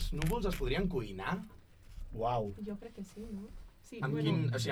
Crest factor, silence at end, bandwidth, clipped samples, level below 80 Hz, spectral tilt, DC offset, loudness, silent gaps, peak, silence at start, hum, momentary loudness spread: 20 dB; 0 s; 16 kHz; under 0.1%; -44 dBFS; -6.5 dB/octave; under 0.1%; -37 LUFS; none; -18 dBFS; 0 s; none; 19 LU